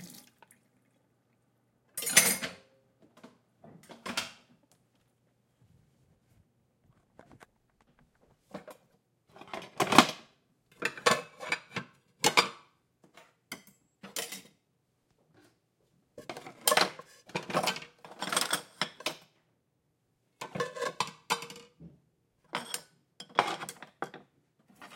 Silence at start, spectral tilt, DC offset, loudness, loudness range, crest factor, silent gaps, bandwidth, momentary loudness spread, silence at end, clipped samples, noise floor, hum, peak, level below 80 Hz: 0 s; -1.5 dB/octave; under 0.1%; -30 LUFS; 15 LU; 36 dB; none; 16.5 kHz; 24 LU; 0 s; under 0.1%; -76 dBFS; none; 0 dBFS; -78 dBFS